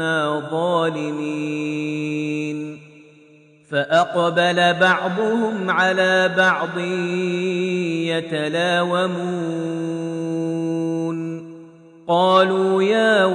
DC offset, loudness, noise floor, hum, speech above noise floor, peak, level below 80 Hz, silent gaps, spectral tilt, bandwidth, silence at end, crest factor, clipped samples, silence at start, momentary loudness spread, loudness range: under 0.1%; -20 LUFS; -50 dBFS; none; 31 dB; -2 dBFS; -72 dBFS; none; -5.5 dB/octave; 10 kHz; 0 s; 18 dB; under 0.1%; 0 s; 10 LU; 6 LU